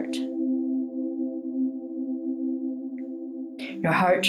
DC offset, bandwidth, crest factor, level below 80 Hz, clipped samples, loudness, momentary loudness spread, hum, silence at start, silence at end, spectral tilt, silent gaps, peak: under 0.1%; 13 kHz; 18 dB; -74 dBFS; under 0.1%; -29 LUFS; 10 LU; none; 0 s; 0 s; -5.5 dB/octave; none; -10 dBFS